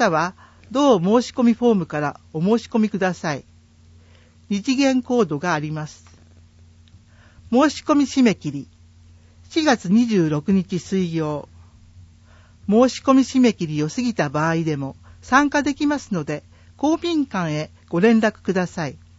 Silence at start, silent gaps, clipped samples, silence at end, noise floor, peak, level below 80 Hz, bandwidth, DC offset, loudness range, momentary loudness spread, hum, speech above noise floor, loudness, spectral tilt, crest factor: 0 s; none; under 0.1%; 0.2 s; -50 dBFS; -2 dBFS; -54 dBFS; 8 kHz; under 0.1%; 4 LU; 11 LU; none; 31 dB; -20 LUFS; -6 dB/octave; 20 dB